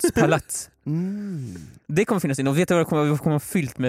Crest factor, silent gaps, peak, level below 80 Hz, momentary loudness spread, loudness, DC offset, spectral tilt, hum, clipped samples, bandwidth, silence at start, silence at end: 16 dB; none; -6 dBFS; -52 dBFS; 11 LU; -23 LUFS; under 0.1%; -6 dB/octave; none; under 0.1%; 16 kHz; 0 s; 0 s